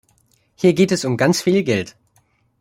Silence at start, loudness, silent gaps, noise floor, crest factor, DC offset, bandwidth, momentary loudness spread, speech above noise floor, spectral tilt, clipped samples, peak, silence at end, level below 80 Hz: 0.6 s; -17 LUFS; none; -61 dBFS; 18 dB; under 0.1%; 16 kHz; 7 LU; 44 dB; -5.5 dB/octave; under 0.1%; -2 dBFS; 0.7 s; -58 dBFS